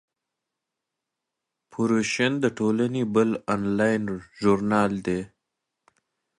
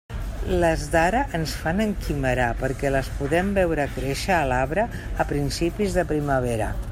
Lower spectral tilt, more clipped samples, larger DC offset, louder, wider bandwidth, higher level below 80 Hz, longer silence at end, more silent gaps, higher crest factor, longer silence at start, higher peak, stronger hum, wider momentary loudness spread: about the same, -6 dB/octave vs -5.5 dB/octave; neither; neither; about the same, -24 LUFS vs -24 LUFS; second, 11 kHz vs 16 kHz; second, -58 dBFS vs -32 dBFS; first, 1.1 s vs 0 s; neither; about the same, 20 dB vs 18 dB; first, 1.75 s vs 0.1 s; about the same, -8 dBFS vs -6 dBFS; neither; first, 8 LU vs 5 LU